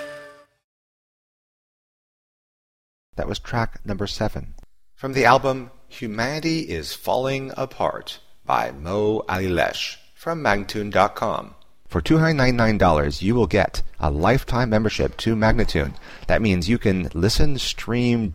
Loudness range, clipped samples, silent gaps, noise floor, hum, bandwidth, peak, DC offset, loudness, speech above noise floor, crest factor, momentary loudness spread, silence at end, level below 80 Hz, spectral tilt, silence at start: 10 LU; under 0.1%; 0.64-3.13 s; -44 dBFS; none; 16 kHz; 0 dBFS; under 0.1%; -22 LUFS; 23 dB; 22 dB; 12 LU; 0 s; -32 dBFS; -6 dB/octave; 0 s